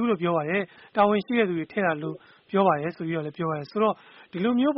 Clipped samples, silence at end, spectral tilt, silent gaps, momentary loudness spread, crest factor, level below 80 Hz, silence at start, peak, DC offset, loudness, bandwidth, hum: under 0.1%; 0 s; -5 dB/octave; none; 9 LU; 18 dB; -66 dBFS; 0 s; -8 dBFS; under 0.1%; -26 LUFS; 5.8 kHz; none